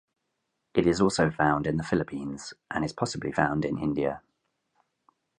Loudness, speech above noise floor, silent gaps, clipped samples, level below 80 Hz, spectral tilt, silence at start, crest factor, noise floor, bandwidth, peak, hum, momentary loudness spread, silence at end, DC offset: -28 LUFS; 53 dB; none; under 0.1%; -52 dBFS; -6 dB/octave; 0.75 s; 22 dB; -80 dBFS; 11 kHz; -8 dBFS; none; 11 LU; 1.2 s; under 0.1%